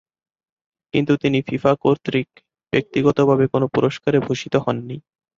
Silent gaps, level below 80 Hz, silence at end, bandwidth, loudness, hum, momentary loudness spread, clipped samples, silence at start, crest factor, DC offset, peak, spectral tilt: none; -54 dBFS; 0.4 s; 7.6 kHz; -20 LUFS; none; 8 LU; under 0.1%; 0.95 s; 18 dB; under 0.1%; -2 dBFS; -7 dB/octave